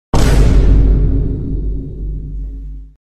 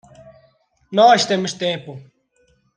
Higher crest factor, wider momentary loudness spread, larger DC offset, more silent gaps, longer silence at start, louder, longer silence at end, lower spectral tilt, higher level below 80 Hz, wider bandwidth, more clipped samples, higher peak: second, 12 dB vs 18 dB; about the same, 16 LU vs 15 LU; neither; neither; second, 0.15 s vs 0.9 s; about the same, -15 LUFS vs -17 LUFS; second, 0.2 s vs 0.75 s; first, -7 dB/octave vs -3.5 dB/octave; first, -14 dBFS vs -64 dBFS; first, 11.5 kHz vs 10 kHz; neither; about the same, 0 dBFS vs -2 dBFS